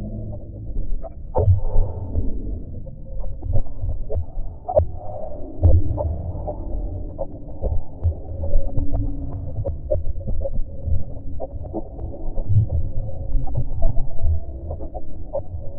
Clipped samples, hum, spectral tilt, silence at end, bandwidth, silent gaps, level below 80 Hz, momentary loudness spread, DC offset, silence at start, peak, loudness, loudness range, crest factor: under 0.1%; none; -14.5 dB/octave; 0 s; 1.3 kHz; none; -24 dBFS; 13 LU; under 0.1%; 0 s; -2 dBFS; -27 LUFS; 4 LU; 16 dB